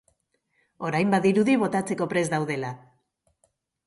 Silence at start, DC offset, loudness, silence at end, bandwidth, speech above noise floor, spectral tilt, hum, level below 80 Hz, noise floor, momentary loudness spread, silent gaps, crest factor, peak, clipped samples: 0.8 s; under 0.1%; -24 LUFS; 1.1 s; 11.5 kHz; 48 dB; -6 dB/octave; none; -68 dBFS; -72 dBFS; 13 LU; none; 16 dB; -10 dBFS; under 0.1%